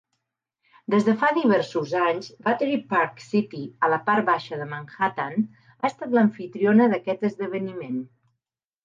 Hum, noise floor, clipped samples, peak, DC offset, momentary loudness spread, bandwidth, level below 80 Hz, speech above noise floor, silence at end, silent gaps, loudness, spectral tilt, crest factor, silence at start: none; -85 dBFS; under 0.1%; -8 dBFS; under 0.1%; 12 LU; 7.4 kHz; -76 dBFS; 61 dB; 0.8 s; none; -24 LUFS; -7 dB/octave; 16 dB; 0.9 s